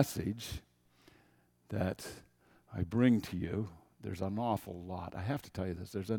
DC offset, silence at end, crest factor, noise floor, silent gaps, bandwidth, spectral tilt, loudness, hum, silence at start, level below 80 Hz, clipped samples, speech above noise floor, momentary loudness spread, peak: under 0.1%; 0 s; 26 dB; -69 dBFS; none; 18 kHz; -6.5 dB/octave; -37 LUFS; none; 0 s; -58 dBFS; under 0.1%; 34 dB; 16 LU; -12 dBFS